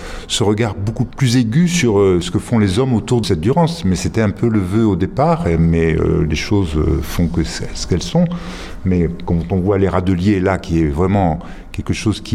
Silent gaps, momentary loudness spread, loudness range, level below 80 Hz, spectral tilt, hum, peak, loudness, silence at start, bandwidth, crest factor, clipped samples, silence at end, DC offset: none; 7 LU; 3 LU; -30 dBFS; -6.5 dB/octave; none; -2 dBFS; -16 LUFS; 0 s; 14.5 kHz; 14 dB; under 0.1%; 0 s; under 0.1%